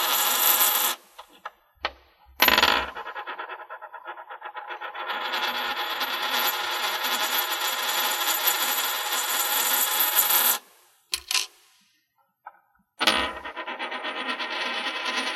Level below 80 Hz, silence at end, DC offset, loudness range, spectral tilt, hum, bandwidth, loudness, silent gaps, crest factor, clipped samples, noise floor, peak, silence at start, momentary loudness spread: -58 dBFS; 0 s; under 0.1%; 7 LU; 1 dB/octave; none; 16 kHz; -23 LUFS; none; 26 dB; under 0.1%; -70 dBFS; 0 dBFS; 0 s; 18 LU